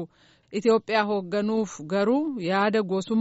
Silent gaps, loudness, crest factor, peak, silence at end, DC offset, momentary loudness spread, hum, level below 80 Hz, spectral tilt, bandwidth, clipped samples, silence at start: none; -25 LUFS; 14 dB; -10 dBFS; 0 s; under 0.1%; 6 LU; none; -70 dBFS; -4.5 dB/octave; 8 kHz; under 0.1%; 0 s